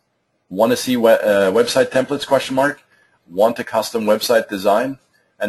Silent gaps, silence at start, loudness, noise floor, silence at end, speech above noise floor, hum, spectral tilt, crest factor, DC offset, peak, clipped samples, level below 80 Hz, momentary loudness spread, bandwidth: none; 0.5 s; -17 LUFS; -67 dBFS; 0 s; 51 dB; none; -4 dB/octave; 16 dB; under 0.1%; -2 dBFS; under 0.1%; -60 dBFS; 10 LU; 13 kHz